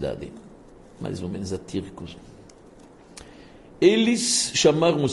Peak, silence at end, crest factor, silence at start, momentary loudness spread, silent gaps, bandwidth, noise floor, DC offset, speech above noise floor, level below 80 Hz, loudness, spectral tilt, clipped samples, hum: -4 dBFS; 0 s; 22 dB; 0 s; 22 LU; none; 11.5 kHz; -49 dBFS; under 0.1%; 26 dB; -54 dBFS; -22 LUFS; -4 dB/octave; under 0.1%; none